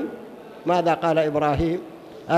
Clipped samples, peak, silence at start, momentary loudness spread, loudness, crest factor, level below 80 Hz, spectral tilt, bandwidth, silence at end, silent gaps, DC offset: under 0.1%; -6 dBFS; 0 s; 19 LU; -23 LUFS; 16 dB; -44 dBFS; -7 dB/octave; 13.5 kHz; 0 s; none; under 0.1%